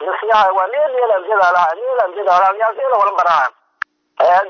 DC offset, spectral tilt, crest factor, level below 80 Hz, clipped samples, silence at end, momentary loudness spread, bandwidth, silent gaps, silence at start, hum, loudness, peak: under 0.1%; -2.5 dB/octave; 12 dB; -64 dBFS; under 0.1%; 0 s; 9 LU; 6.6 kHz; none; 0 s; none; -14 LUFS; -4 dBFS